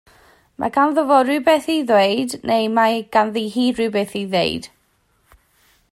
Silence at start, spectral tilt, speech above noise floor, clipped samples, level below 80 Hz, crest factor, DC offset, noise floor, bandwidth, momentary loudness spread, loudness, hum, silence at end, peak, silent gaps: 0.6 s; -4.5 dB/octave; 45 dB; under 0.1%; -58 dBFS; 16 dB; under 0.1%; -62 dBFS; 15.5 kHz; 7 LU; -18 LUFS; none; 1.25 s; -2 dBFS; none